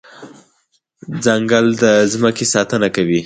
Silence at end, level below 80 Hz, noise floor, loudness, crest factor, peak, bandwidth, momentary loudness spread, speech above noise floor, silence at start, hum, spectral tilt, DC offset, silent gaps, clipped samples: 0 s; -54 dBFS; -63 dBFS; -14 LUFS; 16 dB; 0 dBFS; 9.6 kHz; 4 LU; 49 dB; 0.2 s; none; -4 dB/octave; under 0.1%; none; under 0.1%